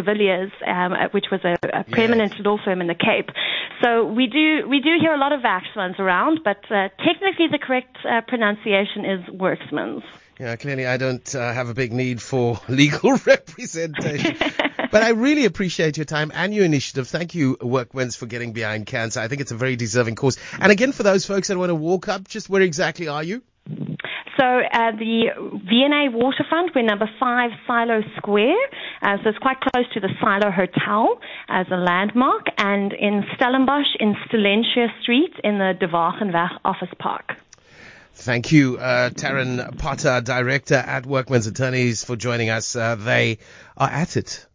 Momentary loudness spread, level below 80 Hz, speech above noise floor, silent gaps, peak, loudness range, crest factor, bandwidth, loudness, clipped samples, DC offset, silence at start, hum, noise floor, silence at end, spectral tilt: 9 LU; -52 dBFS; 26 dB; none; -2 dBFS; 4 LU; 20 dB; 7.6 kHz; -20 LUFS; under 0.1%; under 0.1%; 0 s; none; -46 dBFS; 0.15 s; -5 dB/octave